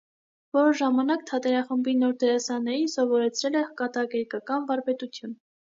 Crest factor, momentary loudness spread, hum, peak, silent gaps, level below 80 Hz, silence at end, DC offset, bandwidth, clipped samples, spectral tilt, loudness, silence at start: 14 dB; 8 LU; none; -12 dBFS; none; -82 dBFS; 0.45 s; under 0.1%; 7.6 kHz; under 0.1%; -3.5 dB/octave; -26 LUFS; 0.55 s